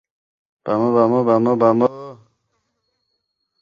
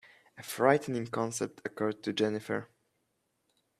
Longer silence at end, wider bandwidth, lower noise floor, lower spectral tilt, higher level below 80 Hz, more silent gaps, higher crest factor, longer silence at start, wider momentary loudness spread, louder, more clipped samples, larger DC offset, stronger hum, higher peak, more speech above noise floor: first, 1.5 s vs 1.15 s; second, 7 kHz vs 14.5 kHz; second, -73 dBFS vs -79 dBFS; first, -9.5 dB/octave vs -4.5 dB/octave; first, -64 dBFS vs -76 dBFS; neither; second, 18 dB vs 26 dB; first, 0.65 s vs 0.35 s; first, 19 LU vs 11 LU; first, -17 LUFS vs -32 LUFS; neither; neither; neither; first, -2 dBFS vs -8 dBFS; first, 58 dB vs 47 dB